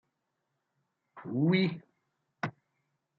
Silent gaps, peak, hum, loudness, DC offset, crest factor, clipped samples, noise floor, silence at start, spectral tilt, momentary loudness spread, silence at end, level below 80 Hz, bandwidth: none; -14 dBFS; none; -31 LUFS; under 0.1%; 20 dB; under 0.1%; -82 dBFS; 1.15 s; -8.5 dB/octave; 18 LU; 0.7 s; -78 dBFS; 6.2 kHz